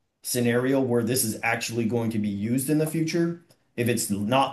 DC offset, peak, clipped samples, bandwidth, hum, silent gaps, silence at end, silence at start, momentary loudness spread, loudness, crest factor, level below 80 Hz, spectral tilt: under 0.1%; -8 dBFS; under 0.1%; 13 kHz; none; none; 0 s; 0.25 s; 6 LU; -25 LUFS; 16 dB; -68 dBFS; -5 dB/octave